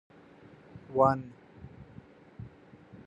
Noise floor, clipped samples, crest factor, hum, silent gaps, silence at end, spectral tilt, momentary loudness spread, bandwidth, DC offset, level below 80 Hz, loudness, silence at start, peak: -55 dBFS; under 0.1%; 24 dB; none; none; 0.1 s; -9 dB/octave; 26 LU; 7.8 kHz; under 0.1%; -64 dBFS; -28 LUFS; 0.75 s; -10 dBFS